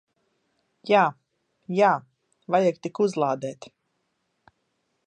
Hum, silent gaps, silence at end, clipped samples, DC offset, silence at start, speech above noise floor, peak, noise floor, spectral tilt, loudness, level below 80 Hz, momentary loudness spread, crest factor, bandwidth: none; none; 1.55 s; under 0.1%; under 0.1%; 0.85 s; 52 dB; -6 dBFS; -75 dBFS; -6 dB/octave; -24 LUFS; -80 dBFS; 13 LU; 20 dB; 9.4 kHz